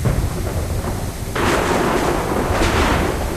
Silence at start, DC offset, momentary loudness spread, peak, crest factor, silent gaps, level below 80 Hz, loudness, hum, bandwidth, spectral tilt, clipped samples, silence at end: 0 s; under 0.1%; 7 LU; -4 dBFS; 14 dB; none; -26 dBFS; -19 LUFS; none; 15.5 kHz; -5 dB/octave; under 0.1%; 0 s